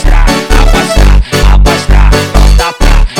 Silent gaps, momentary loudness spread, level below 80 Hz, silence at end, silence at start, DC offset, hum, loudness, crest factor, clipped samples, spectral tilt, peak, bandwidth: none; 2 LU; -6 dBFS; 0 s; 0 s; under 0.1%; none; -8 LUFS; 4 dB; 1%; -5 dB/octave; 0 dBFS; 15 kHz